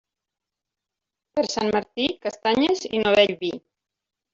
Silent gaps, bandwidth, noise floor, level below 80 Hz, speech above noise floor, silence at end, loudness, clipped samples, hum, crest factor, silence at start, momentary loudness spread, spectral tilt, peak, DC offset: none; 7.8 kHz; -86 dBFS; -60 dBFS; 64 dB; 0.75 s; -23 LUFS; under 0.1%; none; 22 dB; 1.35 s; 12 LU; -4 dB/octave; -4 dBFS; under 0.1%